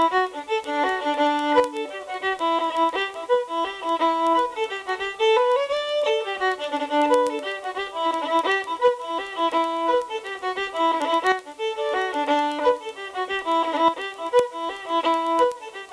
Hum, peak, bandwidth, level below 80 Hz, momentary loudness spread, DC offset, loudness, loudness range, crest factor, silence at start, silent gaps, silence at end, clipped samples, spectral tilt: none; -6 dBFS; 11 kHz; -64 dBFS; 8 LU; under 0.1%; -23 LUFS; 1 LU; 16 dB; 0 s; none; 0 s; under 0.1%; -2.5 dB/octave